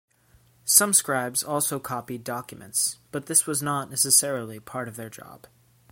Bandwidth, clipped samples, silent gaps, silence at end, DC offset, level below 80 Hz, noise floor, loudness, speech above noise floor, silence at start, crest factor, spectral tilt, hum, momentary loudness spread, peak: 16.5 kHz; under 0.1%; none; 0.55 s; under 0.1%; -68 dBFS; -60 dBFS; -22 LUFS; 34 dB; 0.65 s; 26 dB; -2 dB/octave; none; 17 LU; 0 dBFS